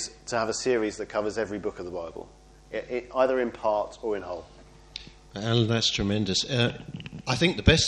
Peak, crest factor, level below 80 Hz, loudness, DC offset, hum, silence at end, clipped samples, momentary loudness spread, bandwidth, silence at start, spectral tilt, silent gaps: -4 dBFS; 24 dB; -44 dBFS; -27 LUFS; under 0.1%; none; 0 s; under 0.1%; 16 LU; 10.5 kHz; 0 s; -4.5 dB/octave; none